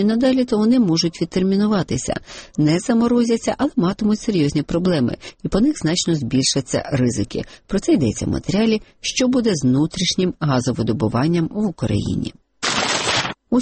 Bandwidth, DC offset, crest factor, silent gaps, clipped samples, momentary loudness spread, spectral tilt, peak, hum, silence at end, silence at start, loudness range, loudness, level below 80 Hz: 8.8 kHz; under 0.1%; 12 dB; none; under 0.1%; 7 LU; -5 dB/octave; -6 dBFS; none; 0 s; 0 s; 2 LU; -19 LUFS; -42 dBFS